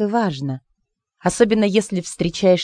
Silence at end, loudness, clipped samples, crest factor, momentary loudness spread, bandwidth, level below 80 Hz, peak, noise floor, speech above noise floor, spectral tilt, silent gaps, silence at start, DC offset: 0 s; -20 LUFS; under 0.1%; 18 dB; 11 LU; 10 kHz; -50 dBFS; 0 dBFS; -71 dBFS; 53 dB; -5.5 dB/octave; none; 0 s; under 0.1%